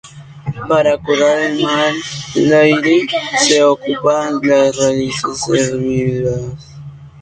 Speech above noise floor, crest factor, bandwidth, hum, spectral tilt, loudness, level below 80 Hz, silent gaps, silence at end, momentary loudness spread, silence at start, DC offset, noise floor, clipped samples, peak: 20 dB; 14 dB; 9.4 kHz; none; -4 dB/octave; -14 LUFS; -46 dBFS; none; 0 s; 14 LU; 0.05 s; under 0.1%; -33 dBFS; under 0.1%; 0 dBFS